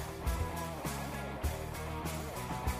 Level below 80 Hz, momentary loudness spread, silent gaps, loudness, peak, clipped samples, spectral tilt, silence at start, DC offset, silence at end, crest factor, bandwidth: -42 dBFS; 3 LU; none; -39 LUFS; -22 dBFS; under 0.1%; -5 dB/octave; 0 s; under 0.1%; 0 s; 16 dB; 15.5 kHz